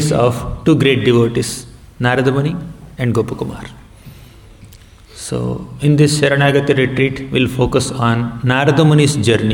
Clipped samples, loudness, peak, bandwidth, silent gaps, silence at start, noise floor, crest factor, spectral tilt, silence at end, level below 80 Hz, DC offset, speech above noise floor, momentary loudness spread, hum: under 0.1%; -15 LUFS; -2 dBFS; 17 kHz; none; 0 s; -40 dBFS; 14 dB; -6 dB/octave; 0 s; -38 dBFS; under 0.1%; 26 dB; 12 LU; none